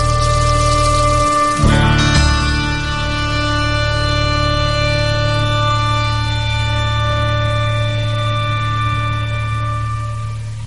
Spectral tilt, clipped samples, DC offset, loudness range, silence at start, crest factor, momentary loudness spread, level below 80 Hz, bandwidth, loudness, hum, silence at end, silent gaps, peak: -5 dB/octave; under 0.1%; 2%; 3 LU; 0 s; 14 dB; 7 LU; -22 dBFS; 11.5 kHz; -16 LUFS; none; 0 s; none; -2 dBFS